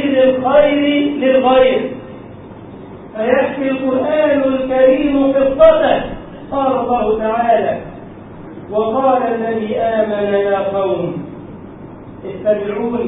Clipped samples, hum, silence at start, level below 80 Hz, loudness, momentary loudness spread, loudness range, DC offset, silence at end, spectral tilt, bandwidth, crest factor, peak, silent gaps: under 0.1%; none; 0 s; -44 dBFS; -14 LUFS; 22 LU; 5 LU; under 0.1%; 0 s; -10 dB/octave; 4 kHz; 14 dB; 0 dBFS; none